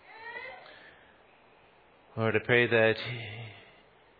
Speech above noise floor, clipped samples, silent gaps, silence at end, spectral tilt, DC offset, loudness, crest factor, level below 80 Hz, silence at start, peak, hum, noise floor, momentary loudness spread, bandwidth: 33 dB; under 0.1%; none; 0.6 s; -8.5 dB/octave; under 0.1%; -28 LUFS; 22 dB; -70 dBFS; 0.1 s; -10 dBFS; none; -60 dBFS; 22 LU; 5 kHz